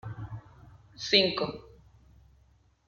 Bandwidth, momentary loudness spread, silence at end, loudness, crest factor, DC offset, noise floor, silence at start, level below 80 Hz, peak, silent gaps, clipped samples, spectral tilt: 7.4 kHz; 23 LU; 1.2 s; -26 LUFS; 26 dB; under 0.1%; -64 dBFS; 0.05 s; -58 dBFS; -8 dBFS; none; under 0.1%; -4 dB/octave